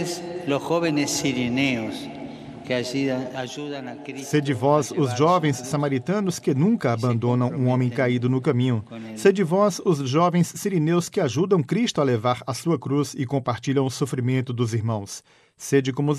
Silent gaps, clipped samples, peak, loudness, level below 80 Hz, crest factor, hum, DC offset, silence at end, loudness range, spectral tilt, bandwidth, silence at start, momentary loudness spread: none; under 0.1%; -4 dBFS; -23 LUFS; -64 dBFS; 18 dB; none; under 0.1%; 0 s; 4 LU; -6 dB/octave; 14 kHz; 0 s; 10 LU